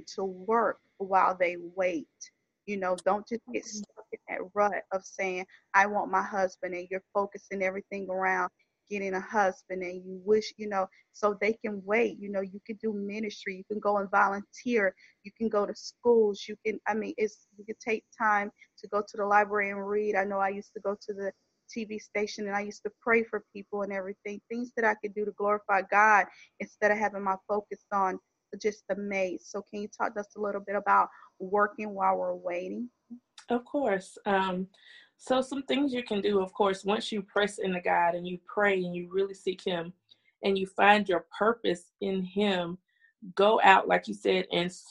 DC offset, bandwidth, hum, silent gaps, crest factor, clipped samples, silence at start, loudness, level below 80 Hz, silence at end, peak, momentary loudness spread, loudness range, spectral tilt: under 0.1%; 11 kHz; none; none; 24 dB; under 0.1%; 0 s; -29 LUFS; -70 dBFS; 0 s; -4 dBFS; 13 LU; 5 LU; -5 dB/octave